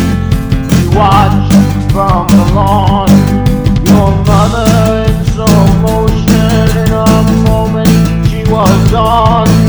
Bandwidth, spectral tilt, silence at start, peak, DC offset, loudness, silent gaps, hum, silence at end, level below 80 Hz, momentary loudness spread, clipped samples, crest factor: over 20 kHz; -6.5 dB/octave; 0 s; 0 dBFS; under 0.1%; -8 LUFS; none; none; 0 s; -18 dBFS; 4 LU; 2%; 8 dB